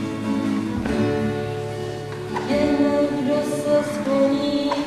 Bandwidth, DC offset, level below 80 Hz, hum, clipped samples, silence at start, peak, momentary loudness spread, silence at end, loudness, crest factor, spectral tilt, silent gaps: 13.5 kHz; under 0.1%; -46 dBFS; none; under 0.1%; 0 s; -8 dBFS; 9 LU; 0 s; -22 LUFS; 14 dB; -6 dB/octave; none